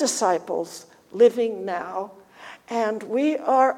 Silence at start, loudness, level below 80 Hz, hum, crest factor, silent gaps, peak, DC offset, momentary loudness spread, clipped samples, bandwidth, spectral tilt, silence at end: 0 s; -23 LUFS; -74 dBFS; none; 18 dB; none; -6 dBFS; under 0.1%; 22 LU; under 0.1%; 15.5 kHz; -3 dB/octave; 0 s